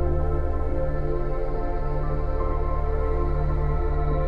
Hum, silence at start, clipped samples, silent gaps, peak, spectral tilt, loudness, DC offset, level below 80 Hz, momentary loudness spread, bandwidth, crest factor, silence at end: none; 0 s; under 0.1%; none; -12 dBFS; -10.5 dB/octave; -28 LUFS; under 0.1%; -26 dBFS; 3 LU; 4.6 kHz; 10 dB; 0 s